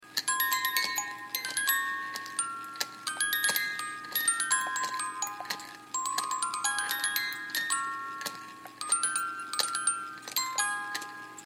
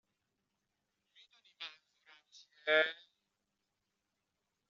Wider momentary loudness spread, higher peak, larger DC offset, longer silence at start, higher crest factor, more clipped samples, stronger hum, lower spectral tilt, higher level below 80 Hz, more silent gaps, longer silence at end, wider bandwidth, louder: second, 10 LU vs 18 LU; first, -8 dBFS vs -18 dBFS; neither; second, 0 s vs 1.6 s; about the same, 24 dB vs 26 dB; neither; neither; about the same, 1.5 dB/octave vs 2.5 dB/octave; first, -82 dBFS vs under -90 dBFS; neither; second, 0 s vs 1.75 s; first, 16.5 kHz vs 7.4 kHz; first, -30 LUFS vs -33 LUFS